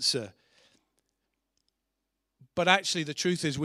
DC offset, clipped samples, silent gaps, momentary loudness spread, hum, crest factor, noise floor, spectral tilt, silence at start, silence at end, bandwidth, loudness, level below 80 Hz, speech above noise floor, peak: under 0.1%; under 0.1%; none; 13 LU; none; 26 dB; -83 dBFS; -3 dB/octave; 0 s; 0 s; 15.5 kHz; -27 LUFS; -68 dBFS; 55 dB; -6 dBFS